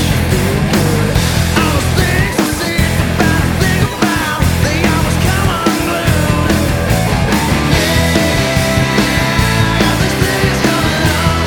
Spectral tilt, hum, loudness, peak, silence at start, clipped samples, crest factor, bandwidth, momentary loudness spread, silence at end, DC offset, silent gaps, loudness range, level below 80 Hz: -5 dB/octave; none; -13 LUFS; 0 dBFS; 0 s; under 0.1%; 12 dB; 19.5 kHz; 2 LU; 0 s; under 0.1%; none; 1 LU; -22 dBFS